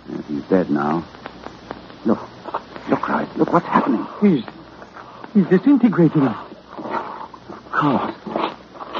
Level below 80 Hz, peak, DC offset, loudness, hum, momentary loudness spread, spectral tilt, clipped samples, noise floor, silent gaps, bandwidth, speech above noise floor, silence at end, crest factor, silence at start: -56 dBFS; -2 dBFS; under 0.1%; -20 LUFS; none; 21 LU; -9 dB/octave; under 0.1%; -39 dBFS; none; 6.6 kHz; 22 dB; 0 s; 20 dB; 0.05 s